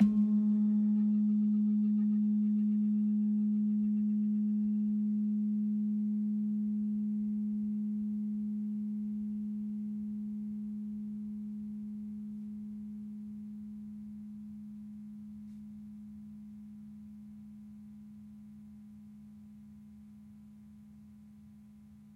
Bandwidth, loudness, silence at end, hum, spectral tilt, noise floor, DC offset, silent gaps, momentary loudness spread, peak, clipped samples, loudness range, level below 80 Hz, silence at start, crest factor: 1.3 kHz; -33 LUFS; 0 s; none; -11 dB/octave; -55 dBFS; under 0.1%; none; 23 LU; -16 dBFS; under 0.1%; 22 LU; -72 dBFS; 0 s; 18 dB